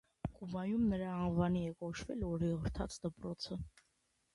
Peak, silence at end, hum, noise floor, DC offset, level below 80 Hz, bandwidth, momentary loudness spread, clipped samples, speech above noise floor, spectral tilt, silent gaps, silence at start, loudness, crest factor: -22 dBFS; 0.65 s; none; -79 dBFS; under 0.1%; -54 dBFS; 11.5 kHz; 10 LU; under 0.1%; 42 dB; -7 dB/octave; none; 0.25 s; -39 LUFS; 18 dB